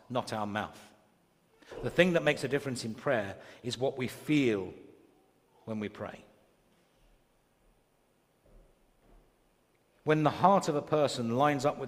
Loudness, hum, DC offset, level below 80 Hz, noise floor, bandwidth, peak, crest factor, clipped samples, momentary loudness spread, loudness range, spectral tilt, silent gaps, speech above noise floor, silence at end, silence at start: -31 LUFS; none; under 0.1%; -66 dBFS; -71 dBFS; 15.5 kHz; -10 dBFS; 24 dB; under 0.1%; 16 LU; 15 LU; -5.5 dB/octave; none; 40 dB; 0 s; 0.1 s